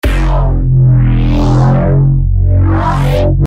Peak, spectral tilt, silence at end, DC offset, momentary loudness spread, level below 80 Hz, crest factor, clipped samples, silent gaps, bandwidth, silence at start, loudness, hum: 0 dBFS; -8.5 dB/octave; 0 s; under 0.1%; 4 LU; -14 dBFS; 8 dB; under 0.1%; none; 8 kHz; 0.05 s; -11 LUFS; none